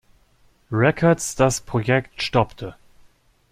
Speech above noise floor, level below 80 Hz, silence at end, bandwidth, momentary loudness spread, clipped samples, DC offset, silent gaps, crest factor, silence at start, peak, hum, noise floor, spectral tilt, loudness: 38 dB; -46 dBFS; 0.8 s; 15.5 kHz; 10 LU; under 0.1%; under 0.1%; none; 20 dB; 0.7 s; -2 dBFS; none; -58 dBFS; -5 dB/octave; -21 LUFS